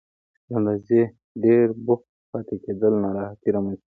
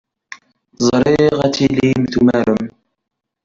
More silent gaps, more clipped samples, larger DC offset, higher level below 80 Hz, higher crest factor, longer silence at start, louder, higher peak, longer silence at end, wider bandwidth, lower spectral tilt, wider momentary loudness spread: first, 1.24-1.35 s, 2.09-2.33 s vs none; neither; neither; second, -58 dBFS vs -44 dBFS; about the same, 16 dB vs 14 dB; first, 0.5 s vs 0.3 s; second, -23 LUFS vs -15 LUFS; second, -6 dBFS vs -2 dBFS; second, 0.2 s vs 0.75 s; second, 3.7 kHz vs 7.6 kHz; first, -12 dB/octave vs -6 dB/octave; first, 12 LU vs 5 LU